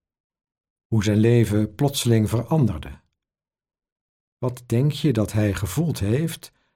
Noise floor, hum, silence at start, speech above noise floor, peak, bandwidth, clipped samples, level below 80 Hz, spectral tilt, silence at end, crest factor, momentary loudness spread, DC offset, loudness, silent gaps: under -90 dBFS; none; 0.9 s; over 69 dB; -6 dBFS; 16.5 kHz; under 0.1%; -46 dBFS; -6.5 dB/octave; 0.3 s; 16 dB; 12 LU; under 0.1%; -22 LUFS; 3.92-4.37 s